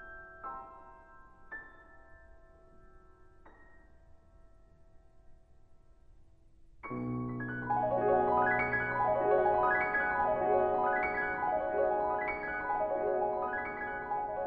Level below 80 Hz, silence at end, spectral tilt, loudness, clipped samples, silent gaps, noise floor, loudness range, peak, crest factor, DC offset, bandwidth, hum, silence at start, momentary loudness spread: -58 dBFS; 0 s; -9.5 dB/octave; -31 LUFS; under 0.1%; none; -58 dBFS; 18 LU; -16 dBFS; 18 dB; under 0.1%; 5.4 kHz; none; 0 s; 17 LU